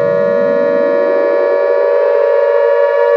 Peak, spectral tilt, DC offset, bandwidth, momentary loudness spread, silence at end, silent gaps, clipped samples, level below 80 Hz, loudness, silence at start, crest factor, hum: -2 dBFS; -7 dB/octave; under 0.1%; 6 kHz; 1 LU; 0 s; none; under 0.1%; -66 dBFS; -12 LUFS; 0 s; 10 dB; none